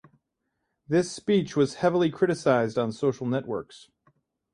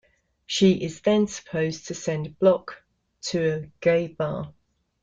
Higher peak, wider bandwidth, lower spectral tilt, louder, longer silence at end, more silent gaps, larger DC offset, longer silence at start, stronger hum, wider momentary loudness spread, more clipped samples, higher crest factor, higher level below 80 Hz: about the same, -8 dBFS vs -8 dBFS; first, 11 kHz vs 9.2 kHz; about the same, -6 dB/octave vs -5.5 dB/octave; about the same, -26 LUFS vs -25 LUFS; first, 0.75 s vs 0.55 s; neither; neither; first, 0.9 s vs 0.5 s; neither; second, 7 LU vs 10 LU; neither; about the same, 18 dB vs 18 dB; second, -64 dBFS vs -58 dBFS